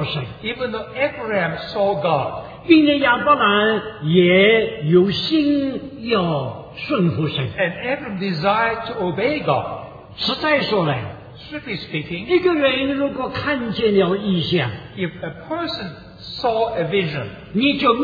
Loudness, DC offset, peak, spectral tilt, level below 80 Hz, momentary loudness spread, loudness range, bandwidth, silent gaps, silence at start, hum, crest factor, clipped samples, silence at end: -19 LUFS; under 0.1%; -2 dBFS; -8 dB/octave; -50 dBFS; 13 LU; 6 LU; 5 kHz; none; 0 s; none; 18 dB; under 0.1%; 0 s